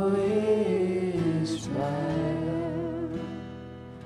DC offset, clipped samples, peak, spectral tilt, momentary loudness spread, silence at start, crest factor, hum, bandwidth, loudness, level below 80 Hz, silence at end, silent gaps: under 0.1%; under 0.1%; -14 dBFS; -7.5 dB/octave; 13 LU; 0 s; 14 dB; none; 11.5 kHz; -28 LUFS; -54 dBFS; 0 s; none